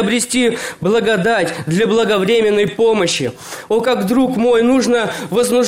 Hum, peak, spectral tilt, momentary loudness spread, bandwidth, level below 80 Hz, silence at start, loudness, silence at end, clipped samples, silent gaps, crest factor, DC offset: none; -6 dBFS; -4.5 dB/octave; 5 LU; 16.5 kHz; -50 dBFS; 0 s; -15 LUFS; 0 s; under 0.1%; none; 10 dB; under 0.1%